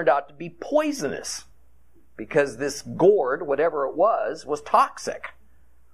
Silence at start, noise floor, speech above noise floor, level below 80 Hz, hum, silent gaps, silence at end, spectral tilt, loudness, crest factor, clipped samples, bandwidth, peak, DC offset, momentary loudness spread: 0 s; -59 dBFS; 36 dB; -60 dBFS; none; none; 0.65 s; -4.5 dB/octave; -23 LUFS; 20 dB; under 0.1%; 14 kHz; -6 dBFS; 0.4%; 16 LU